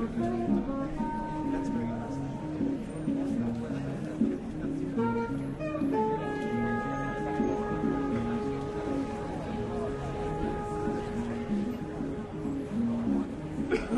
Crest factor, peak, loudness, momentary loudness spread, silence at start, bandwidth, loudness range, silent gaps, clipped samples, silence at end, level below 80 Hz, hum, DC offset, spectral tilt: 16 dB; -16 dBFS; -32 LUFS; 5 LU; 0 s; 11.5 kHz; 3 LU; none; under 0.1%; 0 s; -46 dBFS; none; under 0.1%; -8 dB/octave